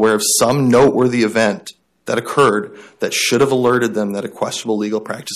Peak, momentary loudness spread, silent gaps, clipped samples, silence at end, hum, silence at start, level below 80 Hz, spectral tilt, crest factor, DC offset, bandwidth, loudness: -4 dBFS; 11 LU; none; under 0.1%; 0 s; none; 0 s; -52 dBFS; -4 dB/octave; 12 dB; under 0.1%; 15 kHz; -16 LUFS